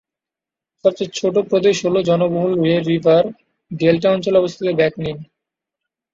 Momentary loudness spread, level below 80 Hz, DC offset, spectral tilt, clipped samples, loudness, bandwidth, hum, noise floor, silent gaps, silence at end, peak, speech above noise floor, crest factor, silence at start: 8 LU; -56 dBFS; under 0.1%; -6 dB/octave; under 0.1%; -17 LUFS; 7.8 kHz; none; -87 dBFS; none; 0.9 s; -2 dBFS; 71 dB; 16 dB; 0.85 s